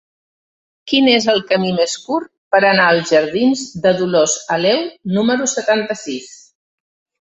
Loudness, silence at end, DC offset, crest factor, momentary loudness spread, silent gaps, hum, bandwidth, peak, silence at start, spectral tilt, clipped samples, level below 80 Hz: -15 LUFS; 0.95 s; under 0.1%; 16 dB; 10 LU; 2.38-2.51 s; none; 8.4 kHz; 0 dBFS; 0.85 s; -3.5 dB/octave; under 0.1%; -60 dBFS